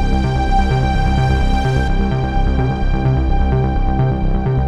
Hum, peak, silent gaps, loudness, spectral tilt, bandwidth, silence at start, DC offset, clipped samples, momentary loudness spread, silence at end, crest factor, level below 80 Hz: none; -2 dBFS; none; -17 LUFS; -7.5 dB/octave; 8.4 kHz; 0 s; under 0.1%; under 0.1%; 2 LU; 0 s; 12 dB; -16 dBFS